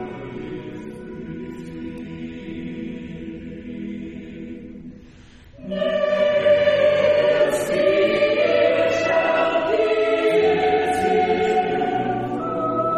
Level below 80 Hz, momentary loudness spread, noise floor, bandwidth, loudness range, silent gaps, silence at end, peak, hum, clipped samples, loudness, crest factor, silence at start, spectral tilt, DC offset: -50 dBFS; 18 LU; -45 dBFS; 13 kHz; 15 LU; none; 0 s; -6 dBFS; none; under 0.1%; -19 LUFS; 14 dB; 0 s; -5.5 dB/octave; under 0.1%